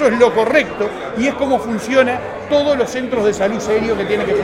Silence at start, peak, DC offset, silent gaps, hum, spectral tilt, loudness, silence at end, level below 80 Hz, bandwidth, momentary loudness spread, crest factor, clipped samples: 0 s; 0 dBFS; under 0.1%; none; none; -5 dB/octave; -16 LUFS; 0 s; -44 dBFS; 15 kHz; 6 LU; 16 dB; under 0.1%